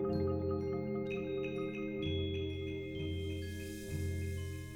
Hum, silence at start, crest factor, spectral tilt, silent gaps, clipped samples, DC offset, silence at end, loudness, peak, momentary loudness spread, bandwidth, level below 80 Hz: none; 0 s; 14 dB; -6.5 dB/octave; none; under 0.1%; under 0.1%; 0 s; -39 LUFS; -24 dBFS; 6 LU; 16.5 kHz; -54 dBFS